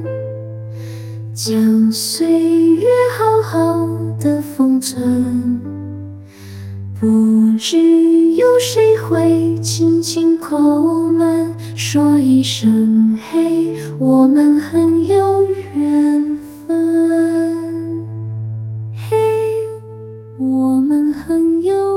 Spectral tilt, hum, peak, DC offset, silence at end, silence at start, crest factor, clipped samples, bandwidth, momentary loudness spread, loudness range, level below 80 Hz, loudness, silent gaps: -6 dB/octave; none; -2 dBFS; under 0.1%; 0 s; 0 s; 12 dB; under 0.1%; 16.5 kHz; 16 LU; 5 LU; -58 dBFS; -14 LUFS; none